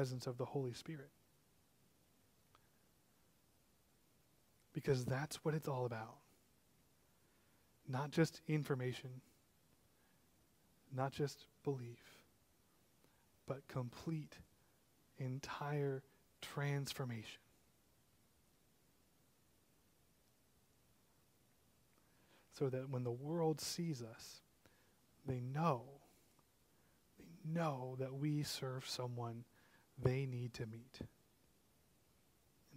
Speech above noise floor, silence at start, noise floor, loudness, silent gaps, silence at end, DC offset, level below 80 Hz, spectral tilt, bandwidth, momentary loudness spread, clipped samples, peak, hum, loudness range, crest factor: 33 dB; 0 s; -76 dBFS; -44 LUFS; none; 0 s; under 0.1%; -76 dBFS; -6 dB/octave; 16 kHz; 16 LU; under 0.1%; -22 dBFS; none; 7 LU; 24 dB